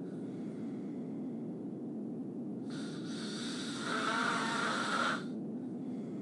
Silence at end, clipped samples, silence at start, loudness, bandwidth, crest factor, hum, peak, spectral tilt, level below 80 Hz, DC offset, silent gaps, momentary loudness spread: 0 s; under 0.1%; 0 s; -38 LUFS; 11.5 kHz; 18 dB; none; -20 dBFS; -4 dB/octave; -82 dBFS; under 0.1%; none; 9 LU